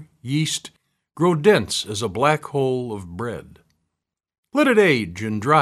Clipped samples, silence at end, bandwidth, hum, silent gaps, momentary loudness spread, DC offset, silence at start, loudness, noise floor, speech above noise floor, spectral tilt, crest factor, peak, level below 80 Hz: under 0.1%; 0 s; 13 kHz; none; 4.38-4.43 s; 14 LU; under 0.1%; 0 s; -21 LUFS; -81 dBFS; 61 dB; -5 dB/octave; 20 dB; -2 dBFS; -56 dBFS